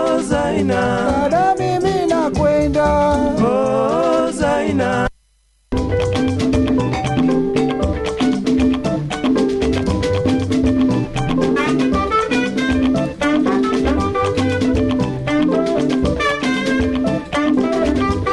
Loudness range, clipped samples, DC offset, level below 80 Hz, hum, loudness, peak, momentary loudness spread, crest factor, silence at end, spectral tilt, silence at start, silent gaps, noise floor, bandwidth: 2 LU; under 0.1%; under 0.1%; -32 dBFS; none; -17 LUFS; -4 dBFS; 3 LU; 12 dB; 0 s; -6.5 dB/octave; 0 s; none; -58 dBFS; 11.5 kHz